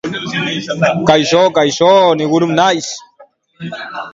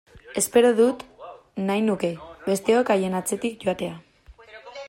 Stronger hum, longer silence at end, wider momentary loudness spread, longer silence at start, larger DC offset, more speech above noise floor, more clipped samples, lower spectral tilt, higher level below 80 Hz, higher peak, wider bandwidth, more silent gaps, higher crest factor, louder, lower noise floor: neither; about the same, 0.05 s vs 0 s; second, 16 LU vs 19 LU; about the same, 0.05 s vs 0.15 s; neither; first, 33 dB vs 26 dB; neither; about the same, -4.5 dB/octave vs -4.5 dB/octave; first, -52 dBFS vs -58 dBFS; first, 0 dBFS vs -6 dBFS; second, 7.8 kHz vs 16 kHz; neither; about the same, 14 dB vs 18 dB; first, -12 LUFS vs -23 LUFS; about the same, -46 dBFS vs -48 dBFS